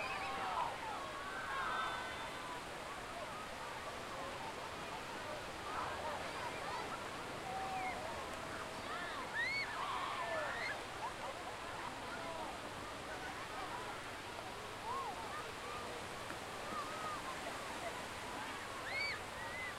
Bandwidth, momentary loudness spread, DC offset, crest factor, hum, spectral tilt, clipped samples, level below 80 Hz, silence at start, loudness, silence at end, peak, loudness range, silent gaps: 16 kHz; 6 LU; under 0.1%; 16 dB; none; -3 dB/octave; under 0.1%; -64 dBFS; 0 s; -43 LUFS; 0 s; -28 dBFS; 4 LU; none